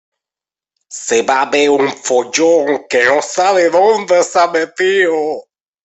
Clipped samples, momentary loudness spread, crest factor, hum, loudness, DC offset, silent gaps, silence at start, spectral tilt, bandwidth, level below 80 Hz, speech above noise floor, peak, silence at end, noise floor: under 0.1%; 6 LU; 14 dB; none; -13 LUFS; under 0.1%; none; 0.9 s; -2.5 dB/octave; 8.4 kHz; -62 dBFS; 77 dB; 0 dBFS; 0.45 s; -89 dBFS